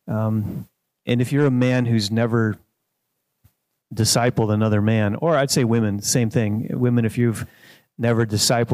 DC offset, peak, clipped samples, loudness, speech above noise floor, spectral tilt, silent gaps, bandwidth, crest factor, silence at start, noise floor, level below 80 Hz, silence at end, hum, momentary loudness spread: under 0.1%; -4 dBFS; under 0.1%; -20 LUFS; 56 dB; -5 dB/octave; none; 15.5 kHz; 16 dB; 0.05 s; -75 dBFS; -56 dBFS; 0 s; none; 8 LU